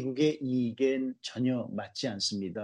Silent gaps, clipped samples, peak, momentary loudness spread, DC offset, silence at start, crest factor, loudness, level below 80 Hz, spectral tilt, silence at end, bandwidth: none; under 0.1%; -14 dBFS; 7 LU; under 0.1%; 0 s; 16 dB; -31 LUFS; -76 dBFS; -5 dB/octave; 0 s; 10 kHz